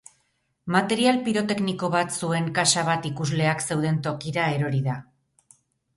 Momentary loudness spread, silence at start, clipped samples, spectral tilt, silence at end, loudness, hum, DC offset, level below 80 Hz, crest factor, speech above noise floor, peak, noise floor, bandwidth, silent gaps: 7 LU; 0.65 s; under 0.1%; -4.5 dB/octave; 0.95 s; -24 LUFS; none; under 0.1%; -62 dBFS; 18 dB; 47 dB; -6 dBFS; -71 dBFS; 11.5 kHz; none